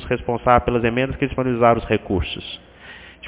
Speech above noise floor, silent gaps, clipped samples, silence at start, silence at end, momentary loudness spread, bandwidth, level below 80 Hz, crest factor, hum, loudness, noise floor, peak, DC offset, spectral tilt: 22 dB; none; under 0.1%; 0 s; 0 s; 20 LU; 4 kHz; -36 dBFS; 20 dB; none; -20 LUFS; -42 dBFS; 0 dBFS; under 0.1%; -10.5 dB/octave